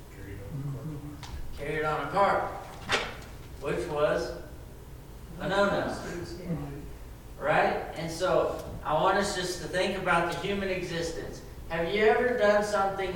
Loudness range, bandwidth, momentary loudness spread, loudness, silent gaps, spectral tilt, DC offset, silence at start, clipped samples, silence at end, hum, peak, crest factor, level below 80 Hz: 4 LU; 19 kHz; 19 LU; -29 LUFS; none; -4.5 dB/octave; under 0.1%; 0 s; under 0.1%; 0 s; none; -12 dBFS; 18 dB; -46 dBFS